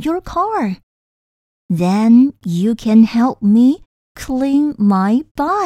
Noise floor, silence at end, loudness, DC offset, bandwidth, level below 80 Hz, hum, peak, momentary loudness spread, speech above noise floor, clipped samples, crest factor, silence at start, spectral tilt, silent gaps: under -90 dBFS; 0 s; -15 LUFS; under 0.1%; 12.5 kHz; -44 dBFS; none; -2 dBFS; 12 LU; over 76 dB; under 0.1%; 12 dB; 0 s; -7.5 dB/octave; 0.83-1.69 s, 3.86-4.15 s, 5.31-5.35 s